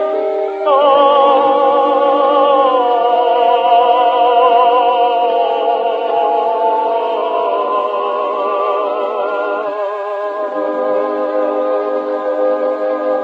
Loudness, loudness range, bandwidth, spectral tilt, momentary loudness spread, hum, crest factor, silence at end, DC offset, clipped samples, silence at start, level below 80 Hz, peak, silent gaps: -14 LUFS; 6 LU; 5.4 kHz; -4.5 dB/octave; 8 LU; none; 14 dB; 0 s; under 0.1%; under 0.1%; 0 s; -78 dBFS; 0 dBFS; none